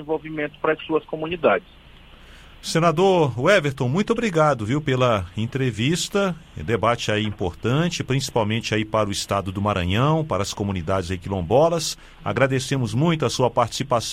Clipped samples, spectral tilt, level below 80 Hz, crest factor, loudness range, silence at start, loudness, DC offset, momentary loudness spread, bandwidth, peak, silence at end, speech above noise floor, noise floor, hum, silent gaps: under 0.1%; -5.5 dB/octave; -46 dBFS; 18 dB; 3 LU; 0 s; -22 LUFS; under 0.1%; 8 LU; 16 kHz; -4 dBFS; 0 s; 24 dB; -46 dBFS; none; none